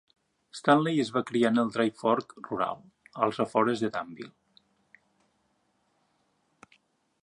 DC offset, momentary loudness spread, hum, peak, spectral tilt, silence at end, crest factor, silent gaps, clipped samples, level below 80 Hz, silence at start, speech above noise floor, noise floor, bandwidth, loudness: under 0.1%; 20 LU; none; -8 dBFS; -6 dB/octave; 2.95 s; 22 dB; none; under 0.1%; -74 dBFS; 0.55 s; 45 dB; -73 dBFS; 11 kHz; -28 LUFS